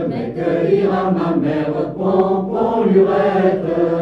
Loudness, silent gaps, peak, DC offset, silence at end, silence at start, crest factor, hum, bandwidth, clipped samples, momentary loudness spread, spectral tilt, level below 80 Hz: -17 LUFS; none; -2 dBFS; under 0.1%; 0 s; 0 s; 14 dB; none; 5.8 kHz; under 0.1%; 6 LU; -9.5 dB/octave; -48 dBFS